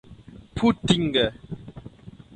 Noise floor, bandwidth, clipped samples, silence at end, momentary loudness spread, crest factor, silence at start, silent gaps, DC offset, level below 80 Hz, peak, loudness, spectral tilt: -46 dBFS; 9.4 kHz; under 0.1%; 0.25 s; 23 LU; 22 dB; 0.1 s; none; under 0.1%; -46 dBFS; -4 dBFS; -23 LUFS; -5.5 dB/octave